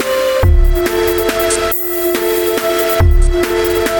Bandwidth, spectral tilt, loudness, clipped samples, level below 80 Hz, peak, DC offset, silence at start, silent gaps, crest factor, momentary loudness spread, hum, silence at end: 18 kHz; -5 dB/octave; -13 LUFS; under 0.1%; -16 dBFS; 0 dBFS; under 0.1%; 0 s; none; 12 dB; 2 LU; none; 0 s